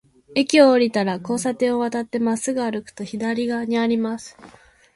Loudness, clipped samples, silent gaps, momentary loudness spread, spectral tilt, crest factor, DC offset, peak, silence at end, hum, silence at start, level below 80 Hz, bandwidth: -21 LUFS; under 0.1%; none; 13 LU; -4.5 dB/octave; 20 dB; under 0.1%; -2 dBFS; 0.45 s; none; 0.3 s; -62 dBFS; 11.5 kHz